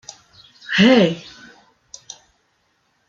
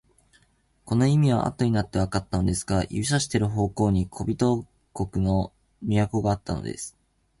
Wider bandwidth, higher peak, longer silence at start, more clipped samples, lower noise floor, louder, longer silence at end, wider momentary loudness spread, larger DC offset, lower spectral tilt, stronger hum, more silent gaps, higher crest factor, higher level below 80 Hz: second, 7.6 kHz vs 11.5 kHz; first, -2 dBFS vs -8 dBFS; second, 0.7 s vs 0.85 s; neither; about the same, -65 dBFS vs -64 dBFS; first, -15 LUFS vs -25 LUFS; first, 1.9 s vs 0.5 s; first, 27 LU vs 11 LU; neither; about the same, -5 dB/octave vs -6 dB/octave; neither; neither; about the same, 20 dB vs 18 dB; second, -60 dBFS vs -42 dBFS